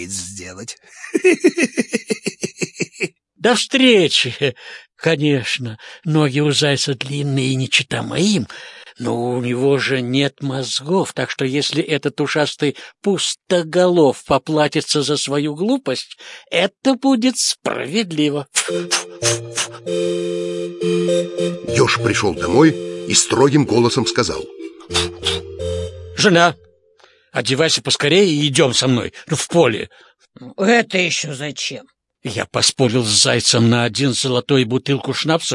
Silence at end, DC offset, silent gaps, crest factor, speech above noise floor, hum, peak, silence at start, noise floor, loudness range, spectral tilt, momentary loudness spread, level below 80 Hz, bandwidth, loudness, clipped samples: 0 s; under 0.1%; none; 18 dB; 36 dB; none; 0 dBFS; 0 s; -53 dBFS; 4 LU; -4 dB/octave; 12 LU; -54 dBFS; 11.5 kHz; -17 LUFS; under 0.1%